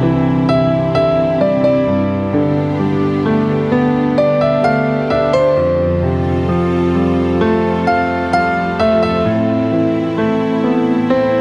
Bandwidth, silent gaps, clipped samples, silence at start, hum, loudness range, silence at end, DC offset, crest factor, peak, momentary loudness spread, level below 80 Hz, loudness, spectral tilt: 9.8 kHz; none; under 0.1%; 0 s; none; 1 LU; 0 s; under 0.1%; 12 dB; -2 dBFS; 3 LU; -38 dBFS; -14 LUFS; -8.5 dB/octave